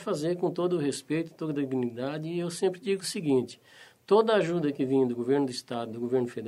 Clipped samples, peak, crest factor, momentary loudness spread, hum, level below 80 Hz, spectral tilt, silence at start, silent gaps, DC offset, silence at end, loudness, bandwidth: under 0.1%; -10 dBFS; 18 dB; 8 LU; none; -74 dBFS; -6 dB/octave; 0 s; none; under 0.1%; 0 s; -29 LUFS; 13.5 kHz